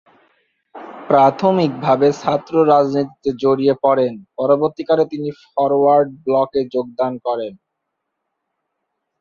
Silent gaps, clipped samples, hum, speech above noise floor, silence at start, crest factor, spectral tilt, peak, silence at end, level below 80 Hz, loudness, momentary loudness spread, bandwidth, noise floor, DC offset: none; under 0.1%; none; 60 dB; 0.75 s; 16 dB; -7.5 dB/octave; -2 dBFS; 1.65 s; -60 dBFS; -17 LUFS; 9 LU; 7.2 kHz; -76 dBFS; under 0.1%